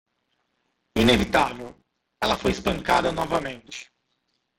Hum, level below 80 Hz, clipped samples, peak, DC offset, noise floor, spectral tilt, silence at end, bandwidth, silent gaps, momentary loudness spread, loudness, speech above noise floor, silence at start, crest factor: none; -44 dBFS; under 0.1%; -4 dBFS; under 0.1%; -74 dBFS; -4.5 dB/octave; 0.75 s; 16.5 kHz; none; 20 LU; -23 LUFS; 51 dB; 0.95 s; 20 dB